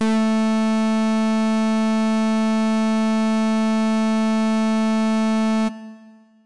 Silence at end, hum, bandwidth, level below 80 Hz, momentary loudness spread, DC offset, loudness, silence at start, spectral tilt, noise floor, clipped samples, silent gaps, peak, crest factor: 0 s; none; 11 kHz; -70 dBFS; 0 LU; 1%; -20 LUFS; 0 s; -6 dB/octave; -48 dBFS; under 0.1%; none; -14 dBFS; 4 dB